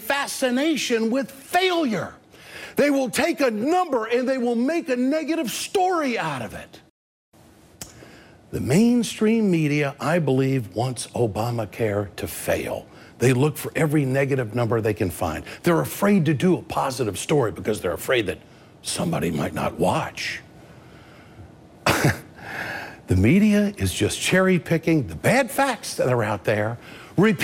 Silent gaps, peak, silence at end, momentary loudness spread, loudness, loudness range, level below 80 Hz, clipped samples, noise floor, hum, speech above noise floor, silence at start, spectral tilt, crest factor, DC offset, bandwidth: 6.90-7.32 s; -6 dBFS; 0 s; 11 LU; -22 LUFS; 5 LU; -52 dBFS; under 0.1%; -47 dBFS; none; 25 dB; 0 s; -5.5 dB/octave; 16 dB; under 0.1%; 16.5 kHz